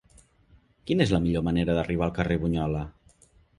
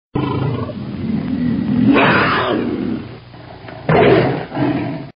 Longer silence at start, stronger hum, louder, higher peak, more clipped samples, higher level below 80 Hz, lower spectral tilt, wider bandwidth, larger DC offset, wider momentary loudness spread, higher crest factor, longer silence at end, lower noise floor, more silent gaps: first, 0.85 s vs 0.15 s; neither; second, -26 LUFS vs -16 LUFS; second, -8 dBFS vs 0 dBFS; neither; about the same, -42 dBFS vs -42 dBFS; first, -7.5 dB/octave vs -5 dB/octave; first, 11 kHz vs 5.4 kHz; neither; second, 9 LU vs 17 LU; about the same, 20 dB vs 16 dB; first, 0.7 s vs 0.05 s; first, -60 dBFS vs -36 dBFS; neither